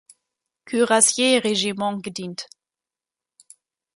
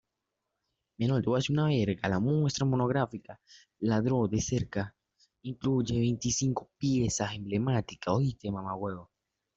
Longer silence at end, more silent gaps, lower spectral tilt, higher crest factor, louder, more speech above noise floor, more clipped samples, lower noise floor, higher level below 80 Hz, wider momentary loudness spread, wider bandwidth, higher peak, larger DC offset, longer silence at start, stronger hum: first, 1.5 s vs 0.55 s; neither; second, -2 dB/octave vs -6 dB/octave; about the same, 22 dB vs 18 dB; first, -20 LUFS vs -30 LUFS; first, 69 dB vs 56 dB; neither; first, -90 dBFS vs -85 dBFS; second, -72 dBFS vs -56 dBFS; first, 18 LU vs 9 LU; first, 12 kHz vs 8 kHz; first, -2 dBFS vs -14 dBFS; neither; second, 0.65 s vs 1 s; neither